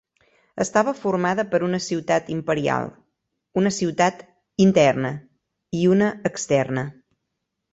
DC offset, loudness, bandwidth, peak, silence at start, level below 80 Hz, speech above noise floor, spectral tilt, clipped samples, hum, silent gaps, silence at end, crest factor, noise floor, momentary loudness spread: under 0.1%; -22 LUFS; 8.2 kHz; -4 dBFS; 0.55 s; -60 dBFS; 58 dB; -5.5 dB/octave; under 0.1%; none; none; 0.8 s; 20 dB; -79 dBFS; 11 LU